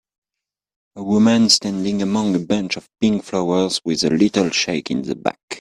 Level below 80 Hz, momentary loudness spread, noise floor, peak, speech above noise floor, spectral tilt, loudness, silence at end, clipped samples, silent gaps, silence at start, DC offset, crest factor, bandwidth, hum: -56 dBFS; 10 LU; -86 dBFS; 0 dBFS; 67 dB; -4 dB/octave; -18 LUFS; 0 s; under 0.1%; 5.43-5.48 s; 0.95 s; under 0.1%; 18 dB; 11 kHz; none